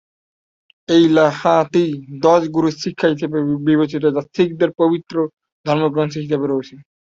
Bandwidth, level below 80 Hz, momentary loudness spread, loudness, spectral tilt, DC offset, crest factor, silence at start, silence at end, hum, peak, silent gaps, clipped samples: 7.6 kHz; -60 dBFS; 8 LU; -17 LUFS; -6.5 dB/octave; under 0.1%; 16 dB; 0.9 s; 0.4 s; none; -2 dBFS; 5.33-5.37 s, 5.52-5.64 s; under 0.1%